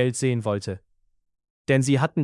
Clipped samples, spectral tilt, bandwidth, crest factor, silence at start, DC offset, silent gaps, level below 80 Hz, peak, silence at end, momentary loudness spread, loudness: under 0.1%; -6 dB/octave; 12 kHz; 18 dB; 0 s; under 0.1%; 1.50-1.65 s; -62 dBFS; -6 dBFS; 0 s; 16 LU; -23 LUFS